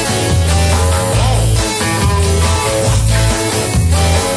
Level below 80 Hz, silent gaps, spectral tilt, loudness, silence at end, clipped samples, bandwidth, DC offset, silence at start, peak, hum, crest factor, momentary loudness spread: -18 dBFS; none; -4.5 dB/octave; -13 LUFS; 0 s; under 0.1%; 11 kHz; under 0.1%; 0 s; -2 dBFS; none; 10 dB; 2 LU